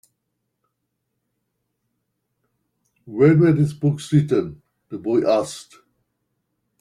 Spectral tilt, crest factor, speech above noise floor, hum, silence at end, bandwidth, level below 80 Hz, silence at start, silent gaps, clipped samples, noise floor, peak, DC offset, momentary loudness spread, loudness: -8 dB/octave; 18 dB; 58 dB; none; 1.2 s; 11 kHz; -60 dBFS; 3.05 s; none; under 0.1%; -76 dBFS; -4 dBFS; under 0.1%; 19 LU; -19 LUFS